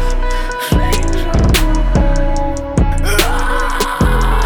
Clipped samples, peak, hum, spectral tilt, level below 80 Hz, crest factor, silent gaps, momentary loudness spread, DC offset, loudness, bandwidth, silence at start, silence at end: under 0.1%; -2 dBFS; none; -5 dB/octave; -14 dBFS; 10 dB; none; 6 LU; under 0.1%; -16 LUFS; over 20 kHz; 0 s; 0 s